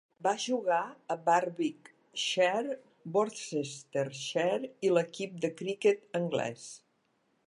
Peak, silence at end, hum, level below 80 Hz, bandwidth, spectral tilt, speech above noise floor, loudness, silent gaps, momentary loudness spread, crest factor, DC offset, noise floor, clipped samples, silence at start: -12 dBFS; 0.7 s; none; -84 dBFS; 11.5 kHz; -4 dB/octave; 43 dB; -32 LUFS; none; 10 LU; 20 dB; under 0.1%; -74 dBFS; under 0.1%; 0.2 s